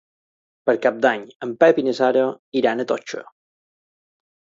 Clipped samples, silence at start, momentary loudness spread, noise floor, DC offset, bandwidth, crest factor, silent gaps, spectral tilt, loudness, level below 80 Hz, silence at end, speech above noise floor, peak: under 0.1%; 0.65 s; 12 LU; under -90 dBFS; under 0.1%; 7.6 kHz; 20 dB; 1.35-1.40 s, 2.39-2.52 s; -5 dB/octave; -20 LUFS; -72 dBFS; 1.35 s; over 71 dB; -2 dBFS